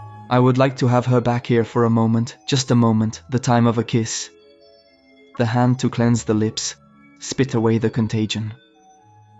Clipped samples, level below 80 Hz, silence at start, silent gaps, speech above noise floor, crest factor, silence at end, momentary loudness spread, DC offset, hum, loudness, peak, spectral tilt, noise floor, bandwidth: under 0.1%; -54 dBFS; 0 s; none; 34 dB; 16 dB; 0.85 s; 9 LU; under 0.1%; none; -19 LUFS; -4 dBFS; -6 dB/octave; -52 dBFS; 8 kHz